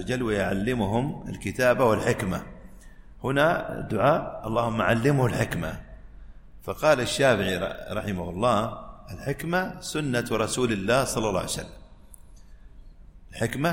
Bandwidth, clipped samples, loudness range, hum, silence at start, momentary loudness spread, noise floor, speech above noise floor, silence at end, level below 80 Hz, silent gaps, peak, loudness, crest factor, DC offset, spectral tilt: 16.5 kHz; under 0.1%; 3 LU; none; 0 s; 12 LU; -47 dBFS; 22 dB; 0 s; -46 dBFS; none; -8 dBFS; -26 LUFS; 18 dB; under 0.1%; -5 dB/octave